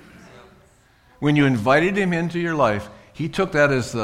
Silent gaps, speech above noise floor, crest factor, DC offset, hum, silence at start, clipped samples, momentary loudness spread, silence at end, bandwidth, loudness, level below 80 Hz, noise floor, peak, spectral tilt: none; 36 dB; 18 dB; under 0.1%; none; 0.35 s; under 0.1%; 11 LU; 0 s; 14 kHz; -20 LUFS; -50 dBFS; -55 dBFS; -4 dBFS; -6.5 dB/octave